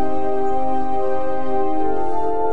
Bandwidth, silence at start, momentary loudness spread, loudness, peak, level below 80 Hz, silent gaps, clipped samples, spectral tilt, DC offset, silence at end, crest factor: 8.4 kHz; 0 s; 1 LU; -23 LUFS; -8 dBFS; -44 dBFS; none; under 0.1%; -8 dB/octave; 20%; 0 s; 12 dB